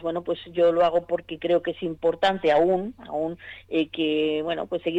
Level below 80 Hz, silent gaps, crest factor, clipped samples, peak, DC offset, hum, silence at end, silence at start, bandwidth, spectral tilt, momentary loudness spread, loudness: -58 dBFS; none; 12 dB; under 0.1%; -12 dBFS; under 0.1%; none; 0 s; 0 s; 8 kHz; -6.5 dB/octave; 10 LU; -24 LUFS